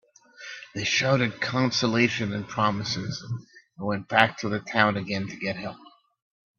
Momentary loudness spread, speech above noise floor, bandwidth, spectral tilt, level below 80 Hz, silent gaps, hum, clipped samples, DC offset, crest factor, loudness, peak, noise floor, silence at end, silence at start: 15 LU; 20 dB; 8.2 kHz; -4.5 dB/octave; -62 dBFS; none; none; under 0.1%; under 0.1%; 26 dB; -25 LUFS; 0 dBFS; -46 dBFS; 0.75 s; 0.4 s